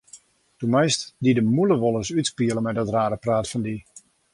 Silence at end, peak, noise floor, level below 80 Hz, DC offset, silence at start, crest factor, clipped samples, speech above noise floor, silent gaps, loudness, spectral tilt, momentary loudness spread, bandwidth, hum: 0.35 s; -6 dBFS; -51 dBFS; -54 dBFS; under 0.1%; 0.15 s; 16 dB; under 0.1%; 29 dB; none; -23 LUFS; -5.5 dB/octave; 9 LU; 11.5 kHz; none